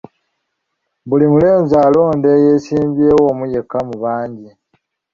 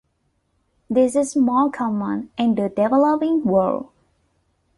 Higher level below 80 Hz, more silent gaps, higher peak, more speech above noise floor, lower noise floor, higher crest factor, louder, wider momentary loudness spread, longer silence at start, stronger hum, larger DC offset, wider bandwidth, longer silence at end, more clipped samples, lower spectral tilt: first, -48 dBFS vs -58 dBFS; neither; first, -2 dBFS vs -6 dBFS; first, 60 dB vs 50 dB; first, -72 dBFS vs -68 dBFS; about the same, 12 dB vs 16 dB; first, -13 LUFS vs -20 LUFS; about the same, 9 LU vs 7 LU; first, 1.05 s vs 0.9 s; neither; neither; second, 7.2 kHz vs 11.5 kHz; second, 0.65 s vs 0.95 s; neither; first, -9 dB/octave vs -6.5 dB/octave